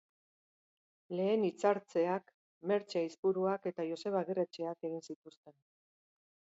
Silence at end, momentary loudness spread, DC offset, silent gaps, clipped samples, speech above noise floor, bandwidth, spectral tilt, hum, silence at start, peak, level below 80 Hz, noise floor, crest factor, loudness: 1.05 s; 11 LU; under 0.1%; 2.34-2.61 s, 3.18-3.23 s, 5.16-5.22 s, 5.37-5.43 s; under 0.1%; over 55 dB; 7.6 kHz; -5.5 dB/octave; none; 1.1 s; -18 dBFS; -88 dBFS; under -90 dBFS; 20 dB; -36 LUFS